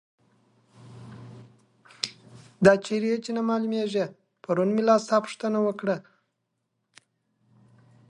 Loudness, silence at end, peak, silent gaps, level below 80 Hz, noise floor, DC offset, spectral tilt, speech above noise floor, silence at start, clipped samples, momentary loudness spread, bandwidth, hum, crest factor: -25 LUFS; 2.1 s; -4 dBFS; none; -68 dBFS; -78 dBFS; under 0.1%; -5.5 dB/octave; 55 dB; 0.85 s; under 0.1%; 24 LU; 11.5 kHz; none; 24 dB